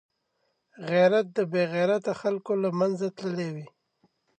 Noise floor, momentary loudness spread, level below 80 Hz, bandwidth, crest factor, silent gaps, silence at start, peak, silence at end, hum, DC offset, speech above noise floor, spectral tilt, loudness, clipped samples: -75 dBFS; 11 LU; -78 dBFS; 9.2 kHz; 18 dB; none; 0.8 s; -10 dBFS; 0.7 s; none; under 0.1%; 50 dB; -7 dB/octave; -26 LUFS; under 0.1%